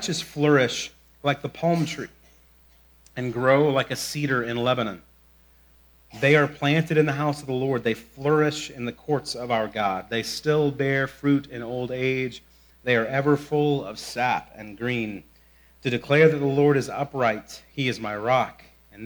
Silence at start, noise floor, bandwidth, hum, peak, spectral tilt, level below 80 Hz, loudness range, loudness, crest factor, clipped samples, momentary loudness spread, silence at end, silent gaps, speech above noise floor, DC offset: 0 s; -56 dBFS; over 20 kHz; none; -4 dBFS; -5.5 dB/octave; -58 dBFS; 3 LU; -24 LUFS; 20 dB; under 0.1%; 13 LU; 0 s; none; 33 dB; under 0.1%